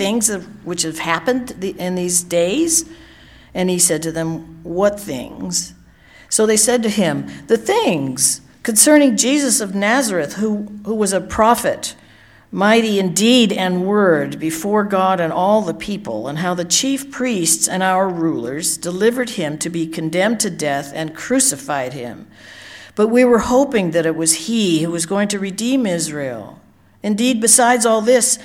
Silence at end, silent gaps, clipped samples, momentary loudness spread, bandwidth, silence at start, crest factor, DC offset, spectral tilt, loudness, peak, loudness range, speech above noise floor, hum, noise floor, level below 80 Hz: 0 s; none; under 0.1%; 12 LU; 17.5 kHz; 0 s; 18 dB; under 0.1%; -3 dB/octave; -16 LUFS; 0 dBFS; 4 LU; 30 dB; none; -46 dBFS; -50 dBFS